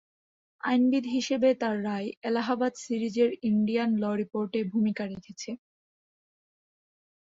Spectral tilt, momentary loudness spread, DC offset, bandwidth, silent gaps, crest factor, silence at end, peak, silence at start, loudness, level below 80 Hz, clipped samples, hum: -5.5 dB/octave; 12 LU; under 0.1%; 7.8 kHz; 2.17-2.22 s; 16 dB; 1.8 s; -12 dBFS; 0.65 s; -28 LUFS; -72 dBFS; under 0.1%; none